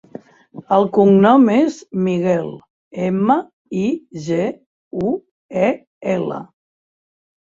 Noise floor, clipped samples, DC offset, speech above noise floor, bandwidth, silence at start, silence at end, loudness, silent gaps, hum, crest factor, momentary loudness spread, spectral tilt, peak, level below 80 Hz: -40 dBFS; under 0.1%; under 0.1%; 24 dB; 7.6 kHz; 0.55 s; 1.05 s; -17 LUFS; 2.70-2.91 s, 3.53-3.65 s, 4.66-4.91 s, 5.31-5.49 s, 5.87-6.01 s; none; 16 dB; 16 LU; -8 dB/octave; -2 dBFS; -60 dBFS